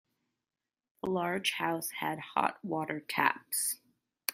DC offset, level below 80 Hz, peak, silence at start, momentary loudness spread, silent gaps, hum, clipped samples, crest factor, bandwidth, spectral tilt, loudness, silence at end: under 0.1%; -76 dBFS; -10 dBFS; 1.05 s; 7 LU; none; none; under 0.1%; 26 dB; 16 kHz; -2.5 dB/octave; -33 LUFS; 0 s